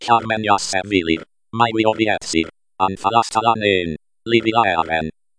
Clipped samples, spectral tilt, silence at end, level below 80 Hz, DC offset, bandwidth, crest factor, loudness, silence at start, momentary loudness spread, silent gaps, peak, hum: under 0.1%; -4 dB/octave; 0.3 s; -48 dBFS; under 0.1%; 10.5 kHz; 18 dB; -18 LUFS; 0 s; 7 LU; none; -2 dBFS; none